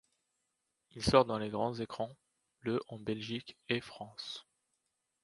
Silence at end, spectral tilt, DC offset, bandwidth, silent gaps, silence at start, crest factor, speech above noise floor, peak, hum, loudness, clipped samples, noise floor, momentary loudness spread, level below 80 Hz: 0.8 s; -5.5 dB/octave; under 0.1%; 11.5 kHz; none; 0.95 s; 28 dB; 49 dB; -10 dBFS; none; -36 LUFS; under 0.1%; -84 dBFS; 16 LU; -60 dBFS